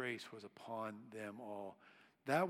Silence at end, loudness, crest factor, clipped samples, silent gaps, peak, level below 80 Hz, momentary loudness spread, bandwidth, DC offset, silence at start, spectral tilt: 0 s; -48 LUFS; 22 dB; under 0.1%; none; -22 dBFS; under -90 dBFS; 10 LU; 16 kHz; under 0.1%; 0 s; -5.5 dB/octave